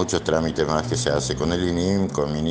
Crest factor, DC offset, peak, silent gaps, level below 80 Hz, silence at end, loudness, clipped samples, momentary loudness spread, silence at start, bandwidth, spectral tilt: 18 dB; under 0.1%; -4 dBFS; none; -40 dBFS; 0 s; -23 LUFS; under 0.1%; 2 LU; 0 s; 10 kHz; -5 dB/octave